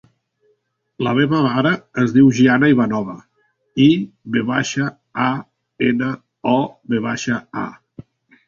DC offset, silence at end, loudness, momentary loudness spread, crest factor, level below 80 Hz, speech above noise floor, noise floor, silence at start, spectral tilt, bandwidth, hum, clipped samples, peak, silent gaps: under 0.1%; 0.45 s; -18 LUFS; 13 LU; 16 dB; -56 dBFS; 49 dB; -66 dBFS; 1 s; -6 dB/octave; 7.4 kHz; none; under 0.1%; -2 dBFS; none